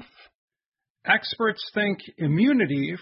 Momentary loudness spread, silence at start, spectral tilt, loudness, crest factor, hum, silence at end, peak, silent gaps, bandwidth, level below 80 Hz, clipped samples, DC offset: 7 LU; 0 s; -10.5 dB/octave; -24 LUFS; 20 dB; none; 0 s; -4 dBFS; 0.35-0.48 s, 0.67-0.72 s, 0.90-0.95 s; 5.8 kHz; -64 dBFS; under 0.1%; under 0.1%